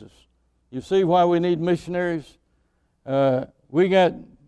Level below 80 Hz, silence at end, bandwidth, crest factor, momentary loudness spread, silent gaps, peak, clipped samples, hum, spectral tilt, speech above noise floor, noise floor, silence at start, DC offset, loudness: -58 dBFS; 0.25 s; 11 kHz; 16 dB; 13 LU; none; -6 dBFS; under 0.1%; none; -7.5 dB/octave; 46 dB; -67 dBFS; 0 s; under 0.1%; -21 LUFS